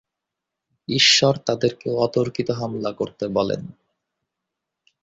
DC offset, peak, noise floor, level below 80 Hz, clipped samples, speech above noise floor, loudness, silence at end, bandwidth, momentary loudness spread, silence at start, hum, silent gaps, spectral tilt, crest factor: under 0.1%; -2 dBFS; -84 dBFS; -58 dBFS; under 0.1%; 63 dB; -20 LUFS; 1.3 s; 8 kHz; 14 LU; 0.9 s; none; none; -3.5 dB/octave; 22 dB